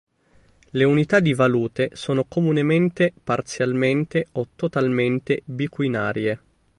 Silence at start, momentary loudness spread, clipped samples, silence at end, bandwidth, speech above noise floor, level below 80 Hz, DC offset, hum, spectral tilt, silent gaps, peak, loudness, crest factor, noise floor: 0.75 s; 8 LU; under 0.1%; 0.4 s; 11.5 kHz; 36 dB; -58 dBFS; under 0.1%; none; -7 dB/octave; none; -4 dBFS; -21 LUFS; 18 dB; -57 dBFS